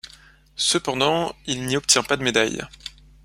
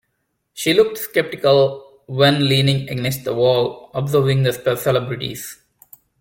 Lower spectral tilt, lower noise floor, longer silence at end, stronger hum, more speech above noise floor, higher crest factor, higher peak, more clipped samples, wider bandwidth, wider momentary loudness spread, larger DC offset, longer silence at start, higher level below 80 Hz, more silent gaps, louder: second, -2.5 dB/octave vs -5.5 dB/octave; second, -50 dBFS vs -72 dBFS; second, 0.35 s vs 0.65 s; neither; second, 28 dB vs 54 dB; about the same, 22 dB vs 18 dB; about the same, -2 dBFS vs -2 dBFS; neither; about the same, 16 kHz vs 17 kHz; first, 19 LU vs 11 LU; neither; second, 0.05 s vs 0.55 s; about the same, -52 dBFS vs -54 dBFS; neither; second, -21 LUFS vs -18 LUFS